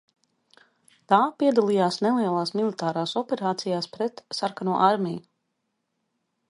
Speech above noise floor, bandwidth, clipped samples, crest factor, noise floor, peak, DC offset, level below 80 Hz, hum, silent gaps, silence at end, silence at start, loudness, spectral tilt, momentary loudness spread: 54 dB; 11.5 kHz; under 0.1%; 22 dB; -78 dBFS; -4 dBFS; under 0.1%; -74 dBFS; none; none; 1.3 s; 1.1 s; -24 LUFS; -5.5 dB/octave; 8 LU